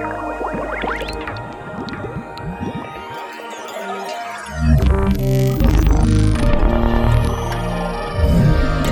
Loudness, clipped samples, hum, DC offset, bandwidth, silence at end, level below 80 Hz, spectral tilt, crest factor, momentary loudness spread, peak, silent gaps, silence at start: -19 LUFS; under 0.1%; none; under 0.1%; 17 kHz; 0 s; -20 dBFS; -7 dB/octave; 16 dB; 14 LU; -2 dBFS; none; 0 s